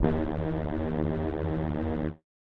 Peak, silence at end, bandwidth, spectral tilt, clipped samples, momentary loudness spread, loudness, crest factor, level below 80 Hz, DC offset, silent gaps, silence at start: -10 dBFS; 0.25 s; 4.7 kHz; -10.5 dB/octave; under 0.1%; 2 LU; -31 LUFS; 20 dB; -42 dBFS; under 0.1%; none; 0 s